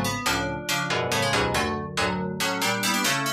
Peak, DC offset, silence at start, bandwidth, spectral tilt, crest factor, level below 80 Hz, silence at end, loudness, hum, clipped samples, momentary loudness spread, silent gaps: -10 dBFS; under 0.1%; 0 s; 15.5 kHz; -3 dB/octave; 14 dB; -46 dBFS; 0 s; -24 LUFS; none; under 0.1%; 4 LU; none